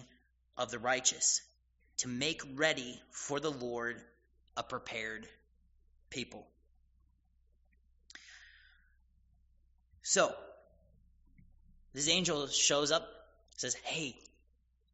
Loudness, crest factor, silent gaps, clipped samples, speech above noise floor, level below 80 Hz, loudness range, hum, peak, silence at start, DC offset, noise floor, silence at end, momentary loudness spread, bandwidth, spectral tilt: -34 LUFS; 26 dB; none; under 0.1%; 37 dB; -68 dBFS; 18 LU; none; -12 dBFS; 0 s; under 0.1%; -73 dBFS; 0.8 s; 21 LU; 8 kHz; -1.5 dB/octave